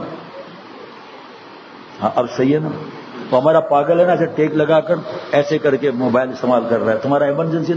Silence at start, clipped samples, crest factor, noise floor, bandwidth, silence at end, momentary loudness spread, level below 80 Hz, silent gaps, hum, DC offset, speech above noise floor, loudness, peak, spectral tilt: 0 s; under 0.1%; 16 dB; -38 dBFS; 7.8 kHz; 0 s; 23 LU; -64 dBFS; none; none; under 0.1%; 22 dB; -16 LUFS; 0 dBFS; -7.5 dB/octave